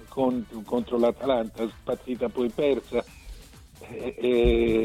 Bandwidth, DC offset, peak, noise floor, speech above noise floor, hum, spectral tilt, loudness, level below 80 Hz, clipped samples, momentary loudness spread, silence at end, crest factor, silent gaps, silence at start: 15 kHz; under 0.1%; -8 dBFS; -45 dBFS; 20 dB; none; -7 dB/octave; -26 LUFS; -40 dBFS; under 0.1%; 14 LU; 0 s; 18 dB; none; 0 s